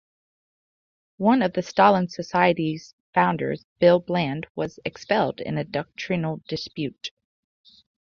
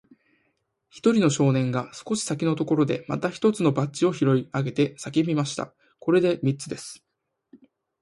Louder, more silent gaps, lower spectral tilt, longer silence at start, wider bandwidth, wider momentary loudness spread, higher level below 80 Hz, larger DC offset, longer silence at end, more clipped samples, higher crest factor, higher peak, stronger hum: about the same, -23 LUFS vs -24 LUFS; first, 2.93-3.13 s, 3.64-3.76 s, 4.50-4.55 s vs none; about the same, -6.5 dB/octave vs -6 dB/octave; first, 1.2 s vs 0.95 s; second, 7.2 kHz vs 11.5 kHz; about the same, 13 LU vs 11 LU; about the same, -62 dBFS vs -64 dBFS; neither; first, 1 s vs 0.45 s; neither; about the same, 20 dB vs 18 dB; first, -4 dBFS vs -8 dBFS; neither